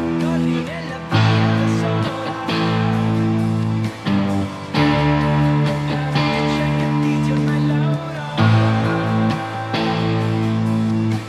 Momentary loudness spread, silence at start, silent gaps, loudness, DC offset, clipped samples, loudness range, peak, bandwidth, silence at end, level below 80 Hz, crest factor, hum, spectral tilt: 6 LU; 0 s; none; -19 LUFS; under 0.1%; under 0.1%; 1 LU; -4 dBFS; 12 kHz; 0 s; -44 dBFS; 14 dB; none; -7 dB/octave